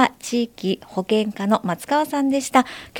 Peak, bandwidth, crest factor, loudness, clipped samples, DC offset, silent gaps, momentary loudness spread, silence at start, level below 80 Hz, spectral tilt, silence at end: -2 dBFS; 17.5 kHz; 20 dB; -21 LUFS; under 0.1%; under 0.1%; none; 6 LU; 0 s; -60 dBFS; -4.5 dB/octave; 0 s